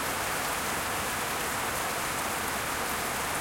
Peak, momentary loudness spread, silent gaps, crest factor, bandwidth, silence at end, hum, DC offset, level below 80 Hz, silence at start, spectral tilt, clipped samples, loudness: -16 dBFS; 1 LU; none; 14 dB; 17 kHz; 0 s; none; under 0.1%; -52 dBFS; 0 s; -2 dB/octave; under 0.1%; -30 LUFS